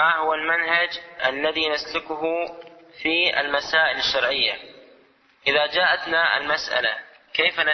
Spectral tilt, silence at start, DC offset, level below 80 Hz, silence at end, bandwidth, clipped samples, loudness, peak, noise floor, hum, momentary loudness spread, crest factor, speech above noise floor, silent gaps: -2 dB/octave; 0 s; under 0.1%; -60 dBFS; 0 s; 6.4 kHz; under 0.1%; -21 LUFS; -6 dBFS; -57 dBFS; none; 7 LU; 18 dB; 34 dB; none